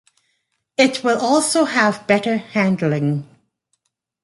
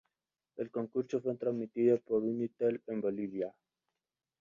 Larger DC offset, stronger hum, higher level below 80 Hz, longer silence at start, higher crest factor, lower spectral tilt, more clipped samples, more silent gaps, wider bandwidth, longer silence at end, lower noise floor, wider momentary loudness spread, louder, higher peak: neither; neither; first, -64 dBFS vs -78 dBFS; first, 0.8 s vs 0.55 s; about the same, 18 dB vs 18 dB; second, -4.5 dB/octave vs -9 dB/octave; neither; neither; first, 11.5 kHz vs 7.2 kHz; about the same, 1 s vs 0.9 s; second, -71 dBFS vs under -90 dBFS; second, 6 LU vs 10 LU; first, -18 LUFS vs -35 LUFS; first, -2 dBFS vs -18 dBFS